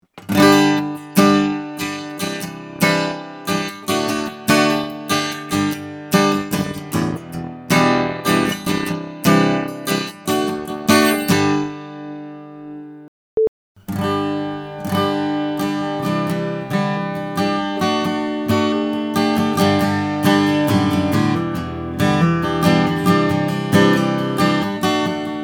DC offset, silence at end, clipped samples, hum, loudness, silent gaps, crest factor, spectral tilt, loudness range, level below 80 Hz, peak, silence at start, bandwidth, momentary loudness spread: under 0.1%; 0 s; under 0.1%; none; -18 LUFS; 13.08-13.37 s, 13.48-13.75 s; 18 dB; -5 dB/octave; 5 LU; -52 dBFS; 0 dBFS; 0.15 s; 19 kHz; 12 LU